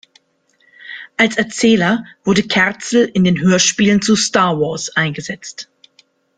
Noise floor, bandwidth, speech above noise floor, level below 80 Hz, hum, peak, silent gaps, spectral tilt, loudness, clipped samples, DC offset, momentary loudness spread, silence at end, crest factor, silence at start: -59 dBFS; 9.6 kHz; 45 dB; -52 dBFS; none; 0 dBFS; none; -4 dB/octave; -14 LUFS; under 0.1%; under 0.1%; 15 LU; 0.75 s; 16 dB; 0.85 s